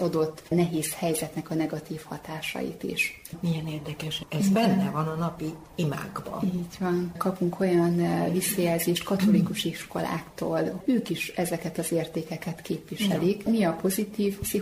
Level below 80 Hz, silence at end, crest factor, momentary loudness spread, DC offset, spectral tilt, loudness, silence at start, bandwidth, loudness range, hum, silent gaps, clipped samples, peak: -56 dBFS; 0 s; 16 dB; 10 LU; under 0.1%; -5.5 dB/octave; -28 LUFS; 0 s; 16 kHz; 4 LU; none; none; under 0.1%; -12 dBFS